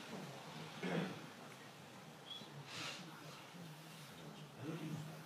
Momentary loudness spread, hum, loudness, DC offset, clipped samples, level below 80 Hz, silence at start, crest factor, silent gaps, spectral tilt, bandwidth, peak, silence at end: 12 LU; none; -49 LUFS; under 0.1%; under 0.1%; under -90 dBFS; 0 s; 22 dB; none; -4.5 dB/octave; 15.5 kHz; -28 dBFS; 0 s